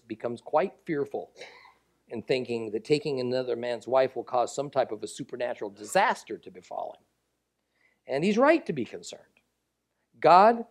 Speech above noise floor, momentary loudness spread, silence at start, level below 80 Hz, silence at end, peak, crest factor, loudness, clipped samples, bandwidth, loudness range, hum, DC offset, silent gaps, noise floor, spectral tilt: 52 dB; 19 LU; 0.1 s; -76 dBFS; 0.1 s; -6 dBFS; 22 dB; -27 LUFS; under 0.1%; 13.5 kHz; 3 LU; none; under 0.1%; none; -79 dBFS; -5 dB/octave